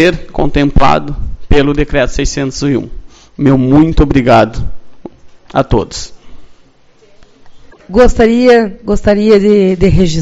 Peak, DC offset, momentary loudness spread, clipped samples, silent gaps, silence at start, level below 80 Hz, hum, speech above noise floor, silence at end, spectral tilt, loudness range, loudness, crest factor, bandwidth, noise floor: 0 dBFS; under 0.1%; 12 LU; 0.9%; none; 0 s; -20 dBFS; none; 35 dB; 0 s; -6.5 dB/octave; 6 LU; -10 LUFS; 10 dB; 8 kHz; -44 dBFS